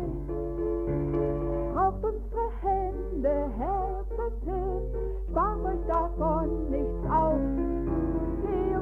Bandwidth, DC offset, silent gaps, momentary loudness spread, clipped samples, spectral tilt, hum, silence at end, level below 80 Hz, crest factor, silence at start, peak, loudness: 3.2 kHz; under 0.1%; none; 6 LU; under 0.1%; -11 dB/octave; none; 0 s; -34 dBFS; 14 dB; 0 s; -14 dBFS; -30 LUFS